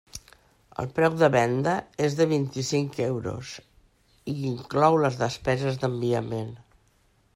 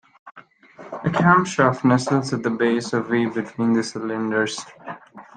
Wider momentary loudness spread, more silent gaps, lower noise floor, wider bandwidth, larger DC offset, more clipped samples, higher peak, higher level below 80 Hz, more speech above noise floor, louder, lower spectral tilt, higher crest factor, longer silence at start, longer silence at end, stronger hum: about the same, 18 LU vs 19 LU; neither; first, -64 dBFS vs -45 dBFS; first, 15.5 kHz vs 9.6 kHz; neither; neither; second, -6 dBFS vs -2 dBFS; about the same, -58 dBFS vs -62 dBFS; first, 39 dB vs 25 dB; second, -25 LUFS vs -21 LUFS; about the same, -6 dB/octave vs -6 dB/octave; about the same, 20 dB vs 20 dB; about the same, 0.15 s vs 0.25 s; first, 0.8 s vs 0.15 s; neither